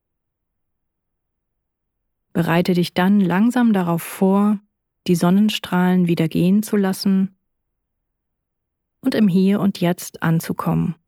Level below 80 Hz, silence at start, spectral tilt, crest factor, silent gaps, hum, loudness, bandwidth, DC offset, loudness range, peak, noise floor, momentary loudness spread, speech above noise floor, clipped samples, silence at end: -58 dBFS; 2.35 s; -6.5 dB/octave; 16 dB; none; none; -18 LUFS; 17 kHz; under 0.1%; 4 LU; -4 dBFS; -78 dBFS; 7 LU; 60 dB; under 0.1%; 0.15 s